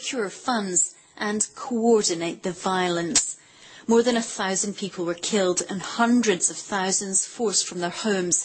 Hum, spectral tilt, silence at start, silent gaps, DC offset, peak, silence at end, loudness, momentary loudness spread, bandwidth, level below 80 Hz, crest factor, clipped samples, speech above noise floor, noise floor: none; -2.5 dB/octave; 0 s; none; under 0.1%; -6 dBFS; 0 s; -23 LUFS; 9 LU; 8.8 kHz; -64 dBFS; 18 dB; under 0.1%; 25 dB; -49 dBFS